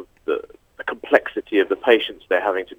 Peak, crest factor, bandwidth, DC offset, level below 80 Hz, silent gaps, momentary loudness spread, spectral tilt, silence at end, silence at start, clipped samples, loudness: 0 dBFS; 22 dB; 17 kHz; under 0.1%; -60 dBFS; none; 12 LU; -4.5 dB/octave; 0.05 s; 0 s; under 0.1%; -21 LUFS